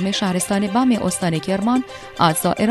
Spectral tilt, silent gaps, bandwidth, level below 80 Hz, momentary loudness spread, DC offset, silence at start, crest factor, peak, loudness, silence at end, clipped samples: -4.5 dB/octave; none; 13.5 kHz; -50 dBFS; 4 LU; under 0.1%; 0 s; 16 dB; -2 dBFS; -19 LUFS; 0 s; under 0.1%